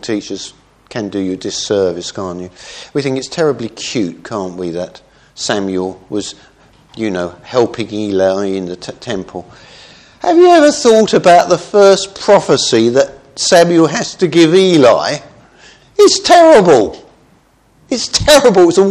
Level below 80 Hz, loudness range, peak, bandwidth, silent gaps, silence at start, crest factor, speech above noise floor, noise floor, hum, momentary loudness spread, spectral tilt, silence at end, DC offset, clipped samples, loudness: -44 dBFS; 10 LU; 0 dBFS; 14.5 kHz; none; 0.05 s; 12 dB; 39 dB; -50 dBFS; none; 17 LU; -4 dB/octave; 0 s; under 0.1%; 0.4%; -11 LUFS